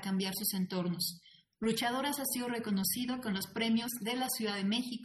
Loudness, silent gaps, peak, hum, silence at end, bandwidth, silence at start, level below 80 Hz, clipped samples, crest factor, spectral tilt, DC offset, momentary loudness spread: -34 LUFS; none; -18 dBFS; none; 0 s; 13.5 kHz; 0 s; -70 dBFS; under 0.1%; 16 dB; -3.5 dB/octave; under 0.1%; 4 LU